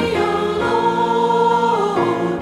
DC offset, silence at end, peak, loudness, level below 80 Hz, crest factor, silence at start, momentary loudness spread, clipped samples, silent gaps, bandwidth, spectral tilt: under 0.1%; 0 s; -6 dBFS; -17 LUFS; -48 dBFS; 12 dB; 0 s; 3 LU; under 0.1%; none; 13 kHz; -6 dB/octave